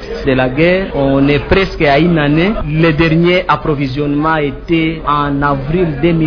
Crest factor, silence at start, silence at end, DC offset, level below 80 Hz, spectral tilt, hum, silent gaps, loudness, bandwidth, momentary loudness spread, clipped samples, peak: 12 dB; 0 s; 0 s; under 0.1%; -28 dBFS; -8.5 dB/octave; none; none; -12 LUFS; 5.4 kHz; 5 LU; under 0.1%; 0 dBFS